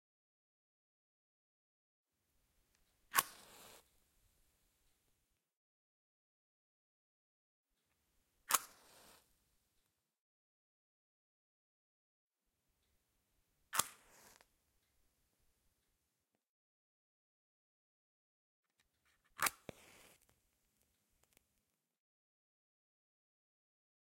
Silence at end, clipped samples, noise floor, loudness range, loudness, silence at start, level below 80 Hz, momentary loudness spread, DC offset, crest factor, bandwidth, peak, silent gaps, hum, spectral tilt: 4.5 s; under 0.1%; -87 dBFS; 2 LU; -38 LUFS; 3.15 s; -86 dBFS; 22 LU; under 0.1%; 40 dB; 16 kHz; -12 dBFS; 5.57-7.64 s, 10.21-12.31 s, 16.49-18.63 s; none; 0.5 dB/octave